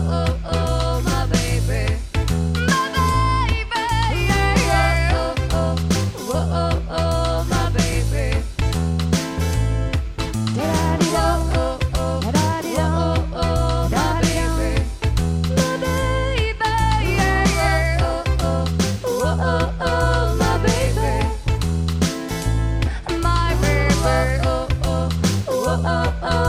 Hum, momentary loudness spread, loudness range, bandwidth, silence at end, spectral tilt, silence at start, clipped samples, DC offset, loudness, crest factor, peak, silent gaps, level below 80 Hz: none; 5 LU; 2 LU; 16 kHz; 0 s; -5.5 dB/octave; 0 s; under 0.1%; under 0.1%; -20 LUFS; 14 dB; -4 dBFS; none; -24 dBFS